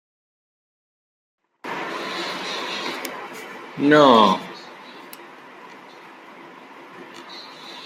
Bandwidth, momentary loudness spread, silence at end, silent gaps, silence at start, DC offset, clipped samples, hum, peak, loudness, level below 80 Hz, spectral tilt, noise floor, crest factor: 16 kHz; 28 LU; 0 s; none; 1.65 s; under 0.1%; under 0.1%; none; -2 dBFS; -20 LUFS; -72 dBFS; -4.5 dB/octave; -43 dBFS; 22 dB